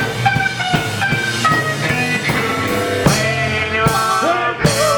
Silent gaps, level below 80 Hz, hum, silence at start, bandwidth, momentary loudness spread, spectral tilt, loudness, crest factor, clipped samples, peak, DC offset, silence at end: none; -38 dBFS; none; 0 s; over 20 kHz; 3 LU; -4 dB/octave; -16 LUFS; 14 dB; under 0.1%; -2 dBFS; under 0.1%; 0 s